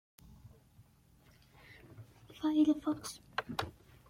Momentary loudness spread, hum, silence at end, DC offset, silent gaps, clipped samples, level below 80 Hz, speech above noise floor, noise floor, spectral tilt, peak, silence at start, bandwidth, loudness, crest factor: 26 LU; none; 0.4 s; under 0.1%; none; under 0.1%; -66 dBFS; 32 dB; -65 dBFS; -5 dB/octave; -18 dBFS; 0.45 s; 16 kHz; -35 LUFS; 20 dB